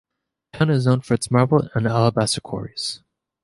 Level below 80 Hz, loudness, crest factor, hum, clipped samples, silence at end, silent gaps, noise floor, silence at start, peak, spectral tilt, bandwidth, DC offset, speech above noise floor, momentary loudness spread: -52 dBFS; -20 LUFS; 18 dB; none; under 0.1%; 0.45 s; none; -50 dBFS; 0.55 s; -2 dBFS; -6 dB/octave; 11.5 kHz; under 0.1%; 31 dB; 10 LU